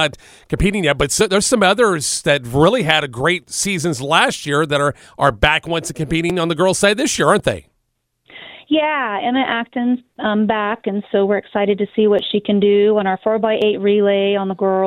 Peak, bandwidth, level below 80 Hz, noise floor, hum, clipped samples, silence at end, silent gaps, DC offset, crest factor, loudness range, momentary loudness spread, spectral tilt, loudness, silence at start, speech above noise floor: 0 dBFS; 16 kHz; -38 dBFS; -69 dBFS; none; under 0.1%; 0 s; none; under 0.1%; 16 dB; 4 LU; 7 LU; -4 dB/octave; -16 LUFS; 0 s; 53 dB